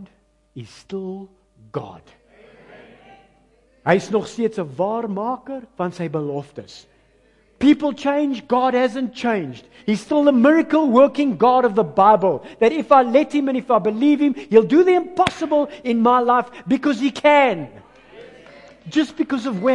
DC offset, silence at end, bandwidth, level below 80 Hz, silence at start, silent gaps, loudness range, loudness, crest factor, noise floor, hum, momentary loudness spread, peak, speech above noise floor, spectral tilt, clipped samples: under 0.1%; 0 s; 10.5 kHz; -58 dBFS; 0 s; none; 10 LU; -18 LUFS; 18 dB; -58 dBFS; none; 16 LU; 0 dBFS; 40 dB; -6.5 dB/octave; under 0.1%